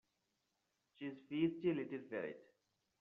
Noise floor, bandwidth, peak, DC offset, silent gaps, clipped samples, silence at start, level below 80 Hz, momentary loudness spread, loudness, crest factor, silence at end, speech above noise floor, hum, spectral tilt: -86 dBFS; 4.7 kHz; -26 dBFS; under 0.1%; none; under 0.1%; 1 s; -84 dBFS; 13 LU; -43 LUFS; 18 dB; 0.6 s; 44 dB; none; -6 dB/octave